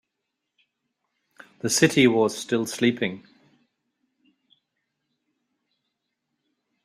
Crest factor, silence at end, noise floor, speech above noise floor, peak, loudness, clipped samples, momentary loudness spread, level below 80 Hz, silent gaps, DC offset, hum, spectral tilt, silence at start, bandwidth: 24 dB; 3.65 s; -82 dBFS; 60 dB; -4 dBFS; -22 LUFS; under 0.1%; 13 LU; -66 dBFS; none; under 0.1%; none; -4 dB/octave; 1.65 s; 15.5 kHz